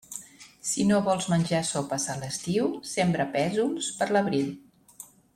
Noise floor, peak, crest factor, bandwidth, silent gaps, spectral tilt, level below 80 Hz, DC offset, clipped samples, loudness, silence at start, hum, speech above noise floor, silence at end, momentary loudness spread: -50 dBFS; -12 dBFS; 16 dB; 15.5 kHz; none; -4.5 dB/octave; -62 dBFS; under 0.1%; under 0.1%; -27 LUFS; 0.1 s; none; 24 dB; 0.3 s; 16 LU